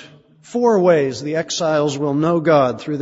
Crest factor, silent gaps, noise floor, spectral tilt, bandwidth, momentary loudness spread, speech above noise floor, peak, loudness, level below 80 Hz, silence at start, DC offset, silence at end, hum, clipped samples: 16 dB; none; -45 dBFS; -5.5 dB/octave; 8 kHz; 7 LU; 28 dB; -2 dBFS; -17 LUFS; -60 dBFS; 0 s; under 0.1%; 0 s; none; under 0.1%